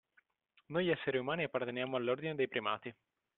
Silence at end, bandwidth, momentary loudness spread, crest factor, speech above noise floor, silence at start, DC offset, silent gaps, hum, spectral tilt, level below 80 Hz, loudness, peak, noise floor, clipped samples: 0.45 s; 4.2 kHz; 6 LU; 18 dB; 38 dB; 0.7 s; under 0.1%; none; none; -3.5 dB/octave; -76 dBFS; -37 LUFS; -20 dBFS; -75 dBFS; under 0.1%